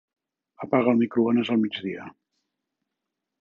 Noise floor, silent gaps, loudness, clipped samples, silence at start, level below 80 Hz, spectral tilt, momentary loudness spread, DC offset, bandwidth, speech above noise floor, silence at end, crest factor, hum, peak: -84 dBFS; none; -24 LUFS; under 0.1%; 0.6 s; -72 dBFS; -8 dB/octave; 15 LU; under 0.1%; 4.2 kHz; 61 dB; 1.3 s; 20 dB; none; -6 dBFS